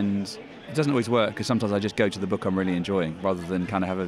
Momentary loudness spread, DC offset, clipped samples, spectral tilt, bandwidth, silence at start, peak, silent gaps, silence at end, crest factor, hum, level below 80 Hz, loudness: 5 LU; under 0.1%; under 0.1%; -6.5 dB/octave; 12.5 kHz; 0 s; -8 dBFS; none; 0 s; 18 dB; none; -58 dBFS; -26 LUFS